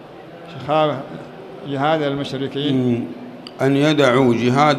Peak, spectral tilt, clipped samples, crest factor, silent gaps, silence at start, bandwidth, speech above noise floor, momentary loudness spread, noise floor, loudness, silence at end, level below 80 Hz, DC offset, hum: -2 dBFS; -6.5 dB/octave; under 0.1%; 16 dB; none; 0 s; 13 kHz; 20 dB; 20 LU; -37 dBFS; -18 LUFS; 0 s; -58 dBFS; under 0.1%; none